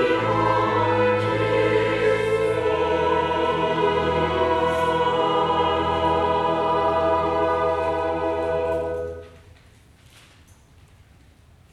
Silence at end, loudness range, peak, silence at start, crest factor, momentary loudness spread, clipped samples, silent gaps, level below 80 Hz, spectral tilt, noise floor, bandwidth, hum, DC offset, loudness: 2.35 s; 7 LU; -8 dBFS; 0 s; 14 dB; 4 LU; under 0.1%; none; -44 dBFS; -6 dB/octave; -52 dBFS; 12 kHz; none; under 0.1%; -21 LUFS